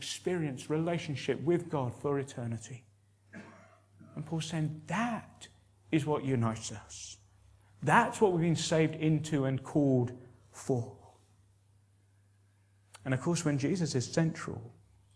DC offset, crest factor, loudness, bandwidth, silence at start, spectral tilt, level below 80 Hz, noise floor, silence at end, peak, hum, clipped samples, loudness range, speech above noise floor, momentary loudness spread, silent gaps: under 0.1%; 24 dB; -32 LUFS; 11 kHz; 0 s; -6 dB/octave; -68 dBFS; -66 dBFS; 0.45 s; -10 dBFS; none; under 0.1%; 9 LU; 34 dB; 21 LU; none